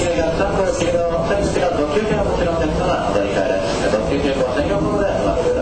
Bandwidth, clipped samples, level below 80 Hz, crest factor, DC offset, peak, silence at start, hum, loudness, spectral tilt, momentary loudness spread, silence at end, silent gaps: 9.2 kHz; under 0.1%; -30 dBFS; 14 dB; under 0.1%; -4 dBFS; 0 s; none; -18 LUFS; -5.5 dB/octave; 1 LU; 0 s; none